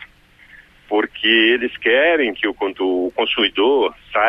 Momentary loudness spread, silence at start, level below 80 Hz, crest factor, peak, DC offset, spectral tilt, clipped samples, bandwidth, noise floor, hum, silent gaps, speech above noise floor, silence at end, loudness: 8 LU; 0 s; -54 dBFS; 16 dB; -2 dBFS; under 0.1%; -5 dB/octave; under 0.1%; 5.4 kHz; -48 dBFS; none; none; 31 dB; 0 s; -17 LUFS